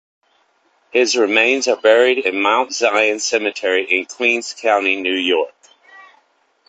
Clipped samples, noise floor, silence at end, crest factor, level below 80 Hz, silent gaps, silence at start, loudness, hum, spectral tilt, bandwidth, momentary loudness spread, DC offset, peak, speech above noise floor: under 0.1%; -60 dBFS; 0.7 s; 18 dB; -66 dBFS; none; 0.95 s; -16 LUFS; none; -1 dB/octave; 9.2 kHz; 6 LU; under 0.1%; 0 dBFS; 44 dB